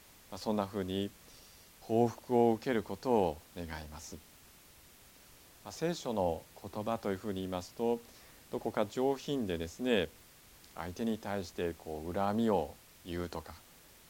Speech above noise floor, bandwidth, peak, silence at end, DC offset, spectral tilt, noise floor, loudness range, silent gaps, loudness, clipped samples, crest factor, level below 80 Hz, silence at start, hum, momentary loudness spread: 24 dB; 17.5 kHz; -14 dBFS; 0.3 s; under 0.1%; -6 dB/octave; -59 dBFS; 6 LU; none; -35 LUFS; under 0.1%; 22 dB; -60 dBFS; 0.3 s; none; 21 LU